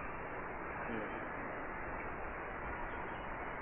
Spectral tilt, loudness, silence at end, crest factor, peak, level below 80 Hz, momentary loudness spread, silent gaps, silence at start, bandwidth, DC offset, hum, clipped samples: -1 dB/octave; -43 LUFS; 0 s; 14 dB; -28 dBFS; -54 dBFS; 2 LU; none; 0 s; 3.6 kHz; under 0.1%; none; under 0.1%